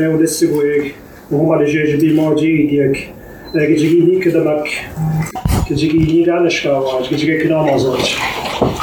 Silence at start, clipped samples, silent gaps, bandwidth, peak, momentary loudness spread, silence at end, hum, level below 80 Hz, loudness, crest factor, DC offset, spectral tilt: 0 s; under 0.1%; none; 19 kHz; 0 dBFS; 7 LU; 0 s; none; -34 dBFS; -14 LUFS; 14 dB; under 0.1%; -6 dB/octave